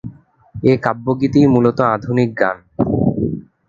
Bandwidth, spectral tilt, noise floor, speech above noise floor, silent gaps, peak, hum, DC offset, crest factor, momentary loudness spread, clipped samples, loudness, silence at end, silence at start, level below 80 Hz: 7.4 kHz; -9 dB/octave; -37 dBFS; 23 dB; none; 0 dBFS; none; under 0.1%; 16 dB; 9 LU; under 0.1%; -16 LUFS; 0.25 s; 0.05 s; -42 dBFS